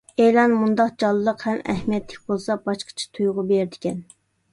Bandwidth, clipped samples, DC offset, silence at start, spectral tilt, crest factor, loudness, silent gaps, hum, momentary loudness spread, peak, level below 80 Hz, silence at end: 11.5 kHz; under 0.1%; under 0.1%; 0.2 s; -6 dB/octave; 16 dB; -22 LUFS; none; none; 11 LU; -4 dBFS; -56 dBFS; 0.5 s